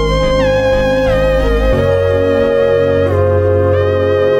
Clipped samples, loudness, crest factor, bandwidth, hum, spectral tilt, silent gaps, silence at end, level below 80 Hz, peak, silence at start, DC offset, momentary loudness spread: under 0.1%; -12 LUFS; 10 dB; 11 kHz; none; -7 dB/octave; none; 0 s; -22 dBFS; -2 dBFS; 0 s; under 0.1%; 1 LU